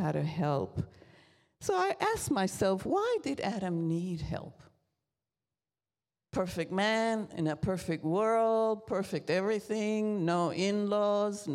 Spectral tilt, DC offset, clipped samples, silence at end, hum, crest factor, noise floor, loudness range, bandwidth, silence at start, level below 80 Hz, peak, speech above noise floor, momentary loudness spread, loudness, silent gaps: -5.5 dB/octave; under 0.1%; under 0.1%; 0 s; none; 16 dB; under -90 dBFS; 6 LU; 15.5 kHz; 0 s; -60 dBFS; -16 dBFS; over 59 dB; 8 LU; -32 LUFS; none